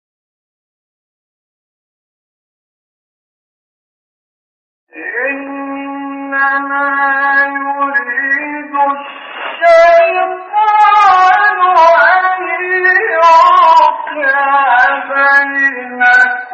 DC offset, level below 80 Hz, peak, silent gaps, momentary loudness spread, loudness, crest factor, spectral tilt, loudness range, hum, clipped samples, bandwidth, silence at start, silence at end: under 0.1%; -60 dBFS; 0 dBFS; none; 15 LU; -9 LUFS; 12 dB; -2.5 dB/octave; 15 LU; none; under 0.1%; 8.2 kHz; 4.95 s; 0 s